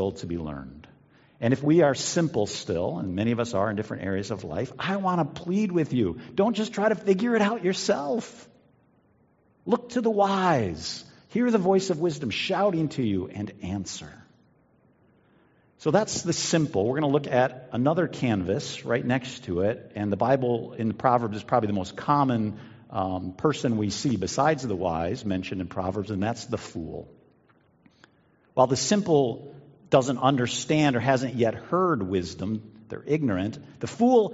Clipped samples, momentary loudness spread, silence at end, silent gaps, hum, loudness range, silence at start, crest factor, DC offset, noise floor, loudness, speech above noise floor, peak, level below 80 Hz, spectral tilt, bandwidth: under 0.1%; 11 LU; 0 s; none; none; 5 LU; 0 s; 22 dB; under 0.1%; -63 dBFS; -26 LUFS; 38 dB; -4 dBFS; -60 dBFS; -5.5 dB/octave; 8 kHz